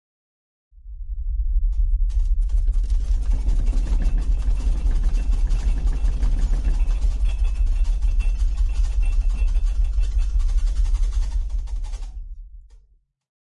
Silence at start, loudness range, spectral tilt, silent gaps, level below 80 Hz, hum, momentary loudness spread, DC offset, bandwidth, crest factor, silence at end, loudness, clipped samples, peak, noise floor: 0.85 s; 2 LU; -6.5 dB/octave; none; -20 dBFS; none; 7 LU; under 0.1%; 7.4 kHz; 10 dB; 1 s; -25 LUFS; under 0.1%; -10 dBFS; -58 dBFS